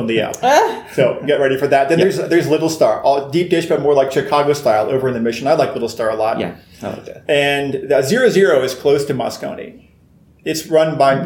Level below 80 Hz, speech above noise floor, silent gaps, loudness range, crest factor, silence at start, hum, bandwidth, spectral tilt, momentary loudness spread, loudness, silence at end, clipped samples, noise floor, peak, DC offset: -54 dBFS; 34 dB; none; 3 LU; 14 dB; 0 s; none; 19 kHz; -5 dB/octave; 12 LU; -15 LUFS; 0 s; under 0.1%; -49 dBFS; 0 dBFS; under 0.1%